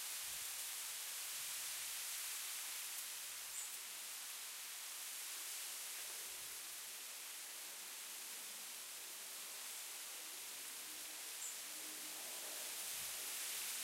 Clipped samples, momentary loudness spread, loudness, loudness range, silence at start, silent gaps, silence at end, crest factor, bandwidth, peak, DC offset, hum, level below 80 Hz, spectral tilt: under 0.1%; 5 LU; -45 LUFS; 4 LU; 0 s; none; 0 s; 18 dB; 16 kHz; -32 dBFS; under 0.1%; none; -88 dBFS; 2.5 dB/octave